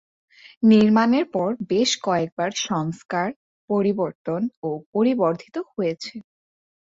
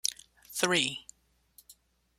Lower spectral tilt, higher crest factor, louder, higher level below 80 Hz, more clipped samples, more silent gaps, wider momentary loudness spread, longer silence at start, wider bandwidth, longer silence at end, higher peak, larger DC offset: first, -5 dB/octave vs -1.5 dB/octave; second, 18 dB vs 28 dB; first, -22 LUFS vs -29 LUFS; first, -66 dBFS vs -72 dBFS; neither; first, 0.57-0.61 s, 2.32-2.37 s, 3.05-3.09 s, 3.36-3.68 s, 4.15-4.25 s, 4.57-4.62 s, 4.86-4.93 s vs none; second, 13 LU vs 18 LU; first, 0.45 s vs 0.05 s; second, 7.8 kHz vs 16 kHz; first, 0.65 s vs 0.45 s; about the same, -6 dBFS vs -8 dBFS; neither